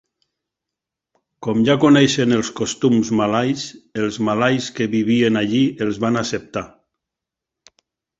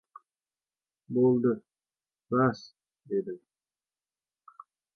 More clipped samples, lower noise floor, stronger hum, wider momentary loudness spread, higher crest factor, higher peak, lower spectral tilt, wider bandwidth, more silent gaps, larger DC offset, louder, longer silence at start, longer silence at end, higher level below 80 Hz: neither; second, -85 dBFS vs under -90 dBFS; neither; second, 13 LU vs 17 LU; about the same, 18 dB vs 20 dB; first, -2 dBFS vs -14 dBFS; second, -5 dB/octave vs -9 dB/octave; first, 8 kHz vs 6.6 kHz; neither; neither; first, -18 LUFS vs -28 LUFS; first, 1.4 s vs 1.1 s; about the same, 1.5 s vs 1.6 s; first, -56 dBFS vs -74 dBFS